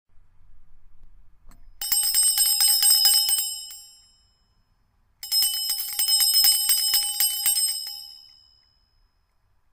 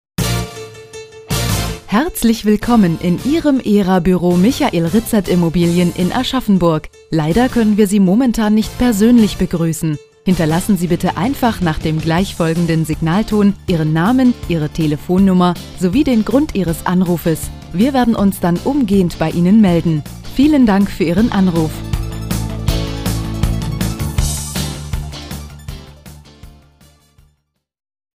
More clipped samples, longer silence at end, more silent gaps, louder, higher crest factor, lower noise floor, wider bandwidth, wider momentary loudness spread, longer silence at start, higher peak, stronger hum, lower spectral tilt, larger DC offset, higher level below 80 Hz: neither; second, 1.55 s vs 1.7 s; neither; second, -18 LUFS vs -15 LUFS; first, 20 dB vs 14 dB; about the same, -66 dBFS vs -65 dBFS; about the same, 16.5 kHz vs 16 kHz; first, 17 LU vs 10 LU; about the same, 0.15 s vs 0.2 s; second, -4 dBFS vs 0 dBFS; neither; second, 5 dB/octave vs -6 dB/octave; neither; second, -56 dBFS vs -30 dBFS